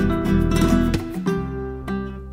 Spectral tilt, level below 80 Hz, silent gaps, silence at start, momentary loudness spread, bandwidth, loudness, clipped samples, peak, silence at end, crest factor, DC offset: -7 dB/octave; -28 dBFS; none; 0 s; 11 LU; 16 kHz; -22 LUFS; under 0.1%; -6 dBFS; 0 s; 16 dB; under 0.1%